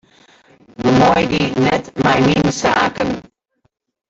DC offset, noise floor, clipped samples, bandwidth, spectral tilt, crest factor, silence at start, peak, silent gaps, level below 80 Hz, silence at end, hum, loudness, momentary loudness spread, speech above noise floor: under 0.1%; -65 dBFS; under 0.1%; 8 kHz; -5.5 dB/octave; 14 dB; 0.8 s; -2 dBFS; none; -42 dBFS; 0.9 s; none; -15 LUFS; 9 LU; 50 dB